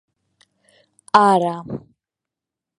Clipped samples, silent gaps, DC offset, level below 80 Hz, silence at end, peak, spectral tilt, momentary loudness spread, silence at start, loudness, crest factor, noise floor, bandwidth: under 0.1%; none; under 0.1%; -62 dBFS; 1 s; 0 dBFS; -5.5 dB/octave; 19 LU; 1.15 s; -16 LUFS; 22 dB; -86 dBFS; 11 kHz